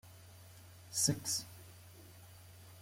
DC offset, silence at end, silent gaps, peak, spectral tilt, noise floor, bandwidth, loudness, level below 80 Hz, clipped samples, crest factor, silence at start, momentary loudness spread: under 0.1%; 0 s; none; -18 dBFS; -2.5 dB/octave; -57 dBFS; 16.5 kHz; -35 LUFS; -72 dBFS; under 0.1%; 24 dB; 0.05 s; 24 LU